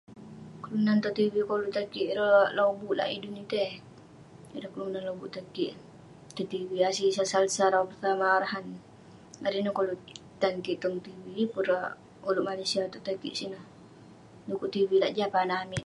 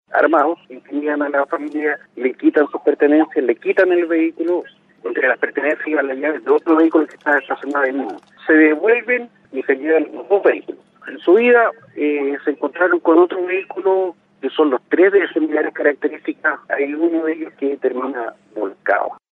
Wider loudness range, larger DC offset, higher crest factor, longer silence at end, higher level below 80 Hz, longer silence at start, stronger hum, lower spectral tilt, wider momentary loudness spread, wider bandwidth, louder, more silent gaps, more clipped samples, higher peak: first, 7 LU vs 2 LU; neither; first, 20 dB vs 14 dB; second, 0 s vs 0.2 s; first, -68 dBFS vs -76 dBFS; about the same, 0.1 s vs 0.1 s; neither; second, -4.5 dB/octave vs -6.5 dB/octave; first, 16 LU vs 12 LU; first, 11.5 kHz vs 4.2 kHz; second, -29 LUFS vs -17 LUFS; neither; neither; second, -10 dBFS vs -2 dBFS